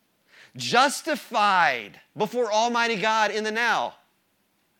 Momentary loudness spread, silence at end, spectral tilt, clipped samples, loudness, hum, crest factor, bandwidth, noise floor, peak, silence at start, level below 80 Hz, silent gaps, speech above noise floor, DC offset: 11 LU; 0.9 s; -2.5 dB/octave; under 0.1%; -23 LUFS; none; 22 dB; 19 kHz; -69 dBFS; -4 dBFS; 0.55 s; -78 dBFS; none; 45 dB; under 0.1%